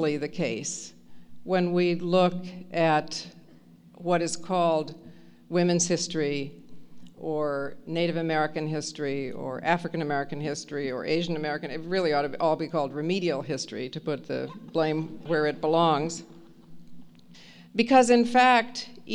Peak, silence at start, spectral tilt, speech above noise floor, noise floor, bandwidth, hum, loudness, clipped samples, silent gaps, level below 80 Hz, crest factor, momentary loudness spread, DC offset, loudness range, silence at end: -6 dBFS; 0 s; -4.5 dB/octave; 27 dB; -53 dBFS; 11 kHz; none; -27 LUFS; under 0.1%; none; -64 dBFS; 20 dB; 13 LU; under 0.1%; 4 LU; 0 s